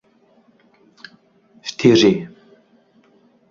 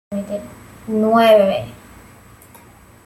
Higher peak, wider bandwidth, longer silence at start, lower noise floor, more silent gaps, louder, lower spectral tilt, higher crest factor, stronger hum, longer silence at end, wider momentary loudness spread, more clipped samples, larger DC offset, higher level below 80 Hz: about the same, -2 dBFS vs -2 dBFS; second, 7.6 kHz vs 15.5 kHz; first, 1.65 s vs 0.1 s; first, -56 dBFS vs -45 dBFS; neither; about the same, -16 LUFS vs -16 LUFS; about the same, -5.5 dB/octave vs -6 dB/octave; about the same, 20 dB vs 18 dB; neither; about the same, 1.25 s vs 1.3 s; second, 20 LU vs 24 LU; neither; neither; second, -60 dBFS vs -52 dBFS